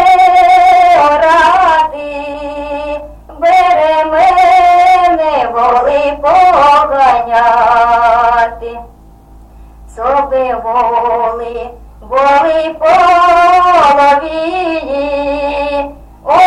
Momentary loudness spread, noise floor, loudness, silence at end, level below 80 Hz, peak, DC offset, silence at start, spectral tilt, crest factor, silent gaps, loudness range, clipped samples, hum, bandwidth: 14 LU; -37 dBFS; -9 LUFS; 0 s; -36 dBFS; 0 dBFS; under 0.1%; 0 s; -4 dB/octave; 10 dB; none; 5 LU; under 0.1%; none; 11 kHz